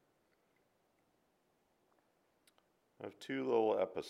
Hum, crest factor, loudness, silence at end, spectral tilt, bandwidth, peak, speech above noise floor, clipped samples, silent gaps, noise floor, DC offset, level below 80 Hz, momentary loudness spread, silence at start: none; 22 dB; -36 LUFS; 0 s; -6 dB/octave; 12.5 kHz; -20 dBFS; 41 dB; under 0.1%; none; -78 dBFS; under 0.1%; -86 dBFS; 19 LU; 3 s